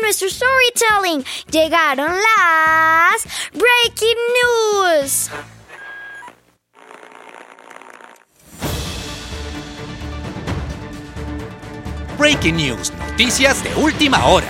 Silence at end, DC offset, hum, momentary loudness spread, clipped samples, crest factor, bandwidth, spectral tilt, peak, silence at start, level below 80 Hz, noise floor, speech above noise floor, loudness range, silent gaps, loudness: 0 s; under 0.1%; none; 19 LU; under 0.1%; 18 dB; 16.5 kHz; -3 dB/octave; 0 dBFS; 0 s; -36 dBFS; -52 dBFS; 37 dB; 17 LU; none; -15 LUFS